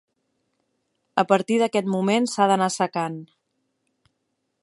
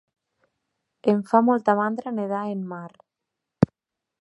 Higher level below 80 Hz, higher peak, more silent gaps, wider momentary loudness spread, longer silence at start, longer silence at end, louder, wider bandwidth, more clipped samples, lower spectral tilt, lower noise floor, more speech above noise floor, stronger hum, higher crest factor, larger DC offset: second, -74 dBFS vs -58 dBFS; about the same, -2 dBFS vs -2 dBFS; neither; second, 9 LU vs 14 LU; about the same, 1.15 s vs 1.05 s; first, 1.4 s vs 0.55 s; about the same, -22 LUFS vs -23 LUFS; about the same, 11.5 kHz vs 11 kHz; neither; second, -5 dB/octave vs -9 dB/octave; second, -76 dBFS vs -86 dBFS; second, 54 dB vs 63 dB; neither; about the same, 22 dB vs 24 dB; neither